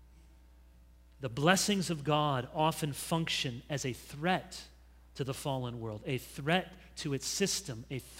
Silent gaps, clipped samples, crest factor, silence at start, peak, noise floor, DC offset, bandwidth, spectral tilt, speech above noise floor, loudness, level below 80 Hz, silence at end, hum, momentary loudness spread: none; under 0.1%; 26 dB; 0 s; -10 dBFS; -59 dBFS; under 0.1%; 16 kHz; -4 dB/octave; 25 dB; -33 LUFS; -58 dBFS; 0 s; none; 13 LU